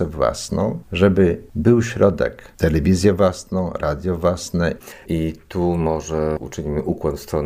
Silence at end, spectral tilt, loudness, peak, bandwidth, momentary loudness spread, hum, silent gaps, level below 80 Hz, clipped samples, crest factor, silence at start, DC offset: 0 s; -6.5 dB/octave; -20 LUFS; -4 dBFS; 16 kHz; 9 LU; none; none; -36 dBFS; under 0.1%; 16 dB; 0 s; under 0.1%